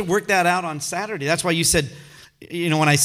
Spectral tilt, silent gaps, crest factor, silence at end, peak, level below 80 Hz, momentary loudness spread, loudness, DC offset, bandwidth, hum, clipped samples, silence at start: -3.5 dB/octave; none; 18 dB; 0 s; -2 dBFS; -46 dBFS; 9 LU; -20 LUFS; under 0.1%; 16.5 kHz; none; under 0.1%; 0 s